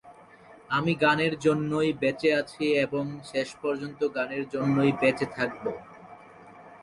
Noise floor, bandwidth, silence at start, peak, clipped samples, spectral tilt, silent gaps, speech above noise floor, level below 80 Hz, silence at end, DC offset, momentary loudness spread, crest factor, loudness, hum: -52 dBFS; 11.5 kHz; 0.05 s; -10 dBFS; under 0.1%; -6 dB/octave; none; 25 dB; -64 dBFS; 0.05 s; under 0.1%; 9 LU; 18 dB; -27 LUFS; none